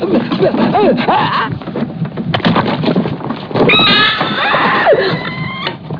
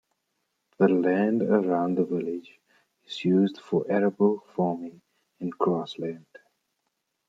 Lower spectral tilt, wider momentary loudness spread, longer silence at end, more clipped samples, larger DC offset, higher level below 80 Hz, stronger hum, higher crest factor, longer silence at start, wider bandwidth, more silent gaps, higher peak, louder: about the same, -7.5 dB/octave vs -8.5 dB/octave; about the same, 12 LU vs 13 LU; second, 0 s vs 1.1 s; neither; neither; first, -44 dBFS vs -74 dBFS; neither; second, 12 dB vs 20 dB; second, 0 s vs 0.8 s; second, 5.4 kHz vs 7.6 kHz; neither; first, 0 dBFS vs -8 dBFS; first, -12 LUFS vs -26 LUFS